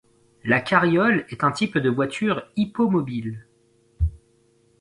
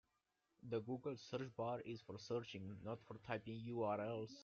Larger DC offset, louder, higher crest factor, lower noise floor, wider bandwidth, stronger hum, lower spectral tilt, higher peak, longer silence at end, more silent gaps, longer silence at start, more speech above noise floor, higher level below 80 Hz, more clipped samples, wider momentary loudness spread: neither; first, -22 LUFS vs -48 LUFS; about the same, 20 dB vs 20 dB; second, -61 dBFS vs -87 dBFS; first, 11 kHz vs 7.4 kHz; neither; about the same, -6.5 dB/octave vs -5.5 dB/octave; first, -4 dBFS vs -28 dBFS; first, 0.65 s vs 0 s; neither; second, 0.45 s vs 0.65 s; about the same, 39 dB vs 40 dB; first, -38 dBFS vs -80 dBFS; neither; first, 12 LU vs 9 LU